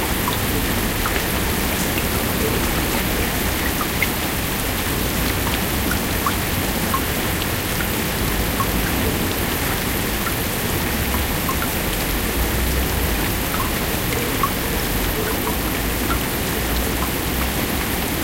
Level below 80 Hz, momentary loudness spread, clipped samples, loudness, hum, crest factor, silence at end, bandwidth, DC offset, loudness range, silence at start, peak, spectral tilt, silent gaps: -28 dBFS; 1 LU; under 0.1%; -20 LUFS; none; 16 dB; 0 s; 16 kHz; under 0.1%; 1 LU; 0 s; -4 dBFS; -3.5 dB/octave; none